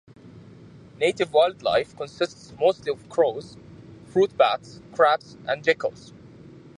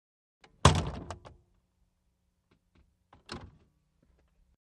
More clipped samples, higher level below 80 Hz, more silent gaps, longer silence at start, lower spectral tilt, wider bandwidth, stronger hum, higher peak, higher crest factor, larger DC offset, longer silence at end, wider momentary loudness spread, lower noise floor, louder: neither; second, -62 dBFS vs -46 dBFS; neither; second, 0.25 s vs 0.65 s; about the same, -4.5 dB/octave vs -4.5 dB/octave; about the same, 10.5 kHz vs 11.5 kHz; neither; about the same, -4 dBFS vs -4 dBFS; second, 22 dB vs 32 dB; neither; second, 0.9 s vs 1.35 s; second, 11 LU vs 21 LU; second, -47 dBFS vs -76 dBFS; first, -24 LUFS vs -27 LUFS